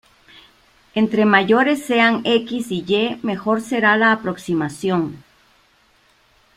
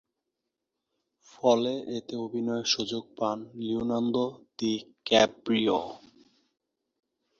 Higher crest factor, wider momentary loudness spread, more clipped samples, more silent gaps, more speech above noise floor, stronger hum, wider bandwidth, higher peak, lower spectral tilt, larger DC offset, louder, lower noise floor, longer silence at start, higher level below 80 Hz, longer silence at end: second, 18 dB vs 24 dB; about the same, 9 LU vs 11 LU; neither; neither; second, 39 dB vs 57 dB; neither; first, 14.5 kHz vs 7.4 kHz; first, -2 dBFS vs -6 dBFS; first, -5.5 dB/octave vs -4 dB/octave; neither; first, -18 LUFS vs -28 LUFS; second, -57 dBFS vs -85 dBFS; second, 0.95 s vs 1.45 s; first, -60 dBFS vs -66 dBFS; about the same, 1.4 s vs 1.4 s